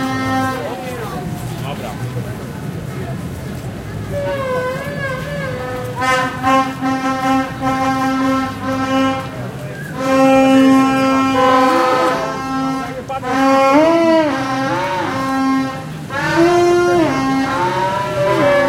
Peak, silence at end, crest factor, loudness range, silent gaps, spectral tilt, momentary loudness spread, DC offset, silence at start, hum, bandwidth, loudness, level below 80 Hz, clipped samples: 0 dBFS; 0 s; 14 dB; 10 LU; none; -5.5 dB/octave; 14 LU; under 0.1%; 0 s; none; 16 kHz; -16 LUFS; -42 dBFS; under 0.1%